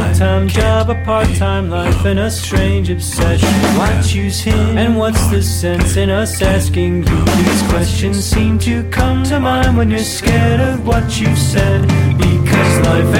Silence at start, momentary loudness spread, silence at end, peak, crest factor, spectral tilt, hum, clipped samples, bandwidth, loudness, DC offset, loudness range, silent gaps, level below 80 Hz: 0 s; 4 LU; 0 s; 0 dBFS; 12 dB; -5.5 dB/octave; none; under 0.1%; 17 kHz; -13 LUFS; under 0.1%; 1 LU; none; -22 dBFS